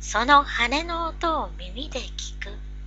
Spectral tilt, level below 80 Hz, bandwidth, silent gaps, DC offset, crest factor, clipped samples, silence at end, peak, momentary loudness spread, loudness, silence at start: -3 dB/octave; -36 dBFS; 8.2 kHz; none; under 0.1%; 22 dB; under 0.1%; 0 s; -2 dBFS; 17 LU; -23 LUFS; 0 s